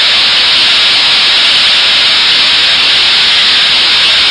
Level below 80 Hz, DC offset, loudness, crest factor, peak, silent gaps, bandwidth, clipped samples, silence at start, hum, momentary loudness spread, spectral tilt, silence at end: -44 dBFS; under 0.1%; -4 LUFS; 8 dB; 0 dBFS; none; 12 kHz; 0.2%; 0 s; none; 0 LU; 0.5 dB/octave; 0 s